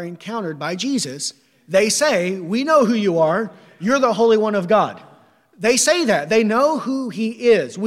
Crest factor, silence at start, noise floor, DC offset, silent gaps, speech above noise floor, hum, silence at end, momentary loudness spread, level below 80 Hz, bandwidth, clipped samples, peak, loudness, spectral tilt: 16 dB; 0 s; -52 dBFS; under 0.1%; none; 34 dB; none; 0 s; 10 LU; -64 dBFS; 15.5 kHz; under 0.1%; -2 dBFS; -18 LUFS; -3.5 dB/octave